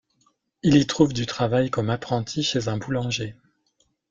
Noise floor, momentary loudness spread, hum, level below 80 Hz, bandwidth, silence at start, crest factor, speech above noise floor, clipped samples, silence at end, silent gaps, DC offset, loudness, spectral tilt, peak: -69 dBFS; 8 LU; none; -52 dBFS; 7.6 kHz; 0.65 s; 20 dB; 46 dB; under 0.1%; 0.8 s; none; under 0.1%; -23 LUFS; -5.5 dB/octave; -4 dBFS